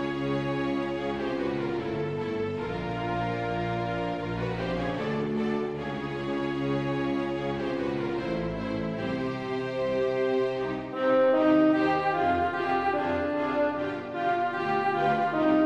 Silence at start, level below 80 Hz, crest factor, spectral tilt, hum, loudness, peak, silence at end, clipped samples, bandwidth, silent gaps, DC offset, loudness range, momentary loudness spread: 0 s; -52 dBFS; 14 dB; -7.5 dB/octave; none; -28 LUFS; -12 dBFS; 0 s; under 0.1%; 8.8 kHz; none; under 0.1%; 5 LU; 7 LU